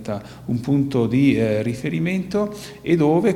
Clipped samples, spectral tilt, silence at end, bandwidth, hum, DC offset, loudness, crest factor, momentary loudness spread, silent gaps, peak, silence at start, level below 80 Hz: under 0.1%; -7.5 dB/octave; 0 s; 15 kHz; none; under 0.1%; -21 LUFS; 14 dB; 11 LU; none; -6 dBFS; 0 s; -50 dBFS